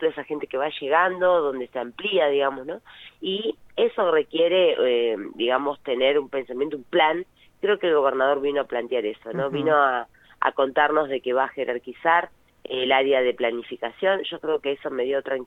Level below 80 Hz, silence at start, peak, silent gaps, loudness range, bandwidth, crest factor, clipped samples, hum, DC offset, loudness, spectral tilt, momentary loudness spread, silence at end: -66 dBFS; 0 s; -4 dBFS; none; 2 LU; 4.1 kHz; 20 dB; under 0.1%; none; under 0.1%; -23 LUFS; -6.5 dB/octave; 10 LU; 0 s